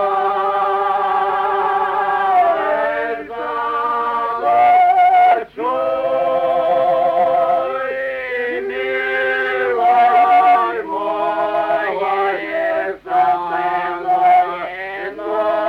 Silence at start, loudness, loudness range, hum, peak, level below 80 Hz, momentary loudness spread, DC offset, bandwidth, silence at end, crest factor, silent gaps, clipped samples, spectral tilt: 0 s; -16 LUFS; 3 LU; none; -4 dBFS; -56 dBFS; 10 LU; under 0.1%; 5.4 kHz; 0 s; 12 dB; none; under 0.1%; -5 dB/octave